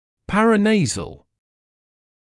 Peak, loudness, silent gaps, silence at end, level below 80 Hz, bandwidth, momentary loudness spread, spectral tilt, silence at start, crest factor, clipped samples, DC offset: -4 dBFS; -18 LUFS; none; 1.1 s; -48 dBFS; 11.5 kHz; 13 LU; -5 dB/octave; 0.3 s; 16 dB; under 0.1%; under 0.1%